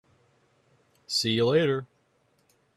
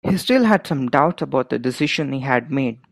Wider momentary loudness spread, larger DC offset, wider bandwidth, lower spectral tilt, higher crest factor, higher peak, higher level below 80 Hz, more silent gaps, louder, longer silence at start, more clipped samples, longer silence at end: about the same, 7 LU vs 7 LU; neither; about the same, 13.5 kHz vs 14.5 kHz; second, -4.5 dB/octave vs -6 dB/octave; about the same, 18 dB vs 18 dB; second, -12 dBFS vs 0 dBFS; second, -68 dBFS vs -58 dBFS; neither; second, -25 LUFS vs -19 LUFS; first, 1.1 s vs 0.05 s; neither; first, 0.9 s vs 0.15 s